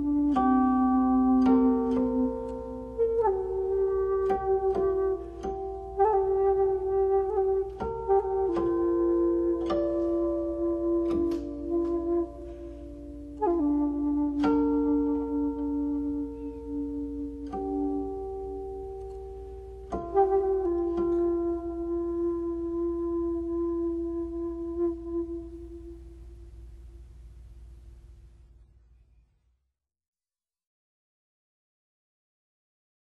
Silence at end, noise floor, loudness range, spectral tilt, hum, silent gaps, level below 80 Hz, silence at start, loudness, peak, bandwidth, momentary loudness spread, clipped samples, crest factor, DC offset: 4.9 s; under -90 dBFS; 9 LU; -9 dB/octave; 60 Hz at -65 dBFS; none; -46 dBFS; 0 s; -28 LUFS; -12 dBFS; 6.6 kHz; 14 LU; under 0.1%; 16 dB; under 0.1%